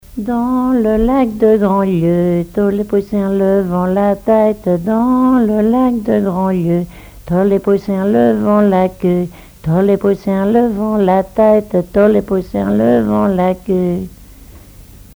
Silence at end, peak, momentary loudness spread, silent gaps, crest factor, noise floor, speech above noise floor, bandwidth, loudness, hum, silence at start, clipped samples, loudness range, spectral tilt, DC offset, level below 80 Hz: 0.2 s; 0 dBFS; 5 LU; none; 12 dB; -38 dBFS; 25 dB; over 20 kHz; -14 LUFS; none; 0.1 s; under 0.1%; 1 LU; -9 dB/octave; under 0.1%; -36 dBFS